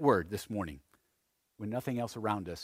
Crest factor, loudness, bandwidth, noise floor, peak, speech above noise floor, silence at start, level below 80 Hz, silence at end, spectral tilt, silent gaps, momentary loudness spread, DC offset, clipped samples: 22 dB; -36 LUFS; 16 kHz; -79 dBFS; -12 dBFS; 45 dB; 0 s; -60 dBFS; 0 s; -6.5 dB/octave; none; 12 LU; under 0.1%; under 0.1%